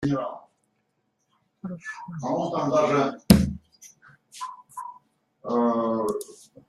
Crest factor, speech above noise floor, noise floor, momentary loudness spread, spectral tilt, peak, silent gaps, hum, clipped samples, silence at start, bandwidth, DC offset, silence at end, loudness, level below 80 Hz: 26 dB; 48 dB; -74 dBFS; 22 LU; -6 dB/octave; 0 dBFS; none; none; under 0.1%; 0 s; 15 kHz; under 0.1%; 0.35 s; -25 LUFS; -46 dBFS